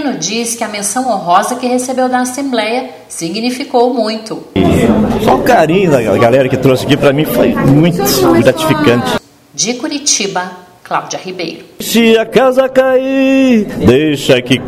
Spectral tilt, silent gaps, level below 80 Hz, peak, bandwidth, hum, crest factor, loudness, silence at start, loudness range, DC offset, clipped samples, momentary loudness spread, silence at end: -4.5 dB/octave; none; -38 dBFS; 0 dBFS; 16 kHz; none; 10 dB; -11 LUFS; 0 s; 5 LU; under 0.1%; 0.2%; 10 LU; 0 s